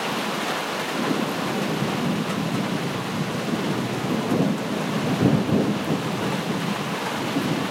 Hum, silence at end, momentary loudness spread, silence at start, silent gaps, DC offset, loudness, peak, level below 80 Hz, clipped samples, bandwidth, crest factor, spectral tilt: none; 0 s; 5 LU; 0 s; none; under 0.1%; -24 LUFS; -6 dBFS; -56 dBFS; under 0.1%; 16 kHz; 18 dB; -5.5 dB/octave